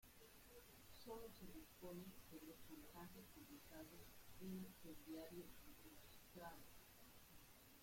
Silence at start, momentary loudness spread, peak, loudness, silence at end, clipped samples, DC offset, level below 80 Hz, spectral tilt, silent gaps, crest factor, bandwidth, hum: 0 s; 9 LU; -44 dBFS; -60 LUFS; 0 s; under 0.1%; under 0.1%; -72 dBFS; -4.5 dB/octave; none; 16 dB; 16.5 kHz; none